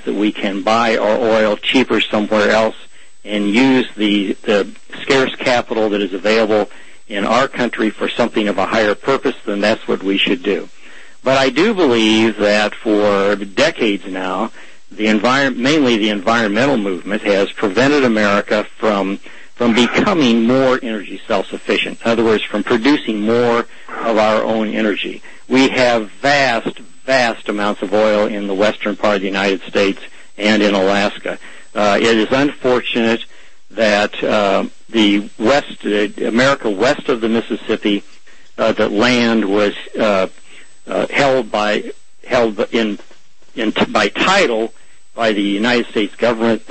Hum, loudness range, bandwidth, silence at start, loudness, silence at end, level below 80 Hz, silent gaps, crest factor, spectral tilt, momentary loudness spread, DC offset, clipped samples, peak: none; 2 LU; 8.8 kHz; 0.05 s; -15 LUFS; 0.1 s; -50 dBFS; none; 14 dB; -4.5 dB/octave; 8 LU; 3%; under 0.1%; -2 dBFS